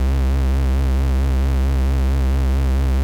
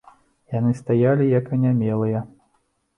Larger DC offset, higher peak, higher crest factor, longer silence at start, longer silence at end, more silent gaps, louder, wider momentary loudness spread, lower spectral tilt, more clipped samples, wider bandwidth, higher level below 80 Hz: neither; second, -12 dBFS vs -6 dBFS; second, 4 dB vs 14 dB; second, 0 s vs 0.5 s; second, 0 s vs 0.7 s; neither; about the same, -19 LUFS vs -21 LUFS; second, 0 LU vs 11 LU; second, -7.5 dB/octave vs -10.5 dB/octave; neither; first, 9.2 kHz vs 6.6 kHz; first, -16 dBFS vs -60 dBFS